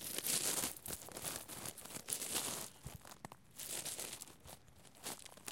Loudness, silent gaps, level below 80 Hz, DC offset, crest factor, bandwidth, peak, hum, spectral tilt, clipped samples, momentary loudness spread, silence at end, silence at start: -41 LUFS; none; -70 dBFS; under 0.1%; 28 dB; 17 kHz; -16 dBFS; none; -1 dB/octave; under 0.1%; 18 LU; 0 s; 0 s